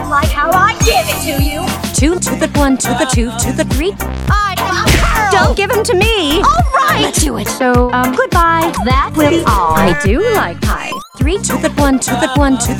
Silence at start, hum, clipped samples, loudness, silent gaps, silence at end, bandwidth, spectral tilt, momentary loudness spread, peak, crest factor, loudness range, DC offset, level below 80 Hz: 0 s; none; under 0.1%; -12 LUFS; none; 0 s; 18.5 kHz; -4.5 dB/octave; 5 LU; 0 dBFS; 12 dB; 2 LU; under 0.1%; -20 dBFS